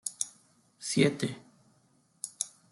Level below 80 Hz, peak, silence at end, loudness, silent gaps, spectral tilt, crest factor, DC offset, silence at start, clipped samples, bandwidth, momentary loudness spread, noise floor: -74 dBFS; -10 dBFS; 0.25 s; -32 LUFS; none; -4 dB/octave; 24 dB; under 0.1%; 0.05 s; under 0.1%; 12.5 kHz; 16 LU; -68 dBFS